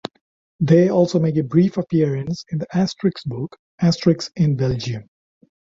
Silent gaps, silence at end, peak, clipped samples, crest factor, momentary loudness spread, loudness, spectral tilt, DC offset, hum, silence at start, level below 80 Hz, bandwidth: 0.21-0.59 s, 3.59-3.78 s; 0.65 s; -2 dBFS; under 0.1%; 18 dB; 13 LU; -19 LUFS; -7.5 dB/octave; under 0.1%; none; 0.05 s; -52 dBFS; 7.6 kHz